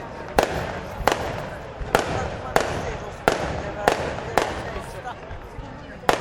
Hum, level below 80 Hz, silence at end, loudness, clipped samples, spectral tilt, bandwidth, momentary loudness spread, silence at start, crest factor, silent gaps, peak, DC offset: none; -38 dBFS; 0 s; -25 LUFS; under 0.1%; -4.5 dB/octave; 17.5 kHz; 12 LU; 0 s; 26 dB; none; 0 dBFS; under 0.1%